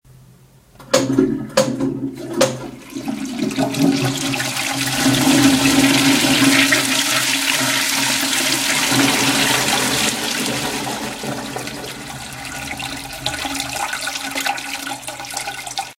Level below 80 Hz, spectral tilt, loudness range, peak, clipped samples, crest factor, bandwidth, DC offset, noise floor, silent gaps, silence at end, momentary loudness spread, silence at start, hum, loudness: -48 dBFS; -2.5 dB/octave; 10 LU; 0 dBFS; under 0.1%; 18 dB; 17 kHz; under 0.1%; -48 dBFS; none; 0.05 s; 14 LU; 0.8 s; none; -17 LUFS